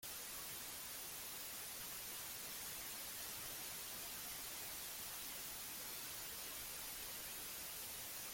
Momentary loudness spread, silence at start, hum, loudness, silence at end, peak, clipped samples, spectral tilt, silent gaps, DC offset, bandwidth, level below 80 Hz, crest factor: 1 LU; 0 s; none; -46 LUFS; 0 s; -36 dBFS; under 0.1%; 0 dB/octave; none; under 0.1%; 17 kHz; -72 dBFS; 14 dB